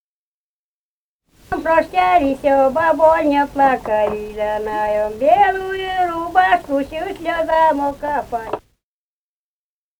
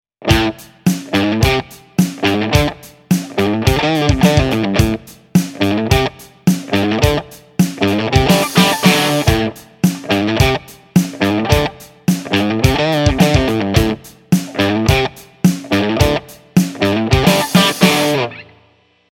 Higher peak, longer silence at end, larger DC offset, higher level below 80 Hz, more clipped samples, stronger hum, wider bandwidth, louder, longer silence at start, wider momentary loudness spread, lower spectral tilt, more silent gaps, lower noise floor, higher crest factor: about the same, 0 dBFS vs 0 dBFS; first, 1.4 s vs 0.7 s; neither; second, -44 dBFS vs -30 dBFS; neither; neither; first, over 20 kHz vs 17.5 kHz; about the same, -17 LUFS vs -15 LUFS; first, 1.5 s vs 0.2 s; about the same, 10 LU vs 8 LU; about the same, -5.5 dB/octave vs -5 dB/octave; neither; first, under -90 dBFS vs -54 dBFS; about the same, 18 dB vs 14 dB